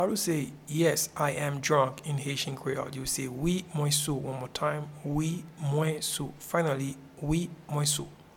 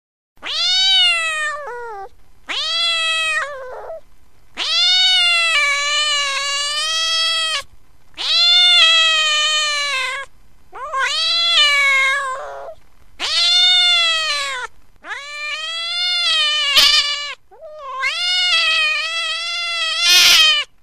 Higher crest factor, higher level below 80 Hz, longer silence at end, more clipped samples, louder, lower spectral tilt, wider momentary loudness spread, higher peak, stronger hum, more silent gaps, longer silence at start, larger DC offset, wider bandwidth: about the same, 20 dB vs 18 dB; about the same, -54 dBFS vs -52 dBFS; about the same, 0.15 s vs 0.15 s; neither; second, -30 LUFS vs -13 LUFS; first, -4.5 dB/octave vs 3 dB/octave; second, 7 LU vs 19 LU; second, -12 dBFS vs 0 dBFS; neither; neither; second, 0 s vs 0.4 s; second, under 0.1% vs 1%; first, 18.5 kHz vs 15.5 kHz